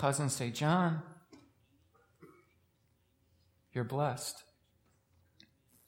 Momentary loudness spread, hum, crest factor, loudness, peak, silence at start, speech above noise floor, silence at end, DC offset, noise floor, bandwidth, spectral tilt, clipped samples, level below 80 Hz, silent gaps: 13 LU; none; 22 dB; -34 LUFS; -16 dBFS; 0 s; 40 dB; 1.45 s; under 0.1%; -74 dBFS; 16.5 kHz; -5 dB/octave; under 0.1%; -78 dBFS; none